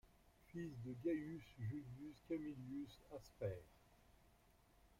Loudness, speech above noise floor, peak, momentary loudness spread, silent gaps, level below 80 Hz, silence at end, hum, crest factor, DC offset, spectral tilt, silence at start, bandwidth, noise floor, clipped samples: -50 LUFS; 24 dB; -34 dBFS; 12 LU; none; -72 dBFS; 0.05 s; none; 18 dB; under 0.1%; -8 dB/octave; 0.05 s; 16 kHz; -73 dBFS; under 0.1%